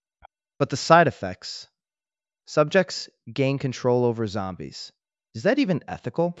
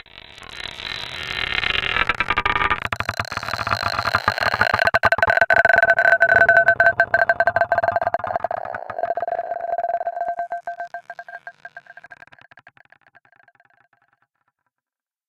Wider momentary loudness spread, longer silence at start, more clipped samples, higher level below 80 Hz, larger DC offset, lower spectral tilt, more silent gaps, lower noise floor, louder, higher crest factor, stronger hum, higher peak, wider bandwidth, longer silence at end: about the same, 19 LU vs 18 LU; first, 0.6 s vs 0.15 s; neither; second, -66 dBFS vs -46 dBFS; neither; first, -5.5 dB/octave vs -3.5 dB/octave; neither; about the same, under -90 dBFS vs -87 dBFS; second, -23 LUFS vs -19 LUFS; about the same, 24 dB vs 20 dB; neither; about the same, -2 dBFS vs 0 dBFS; second, 8.2 kHz vs 15.5 kHz; second, 0 s vs 3.15 s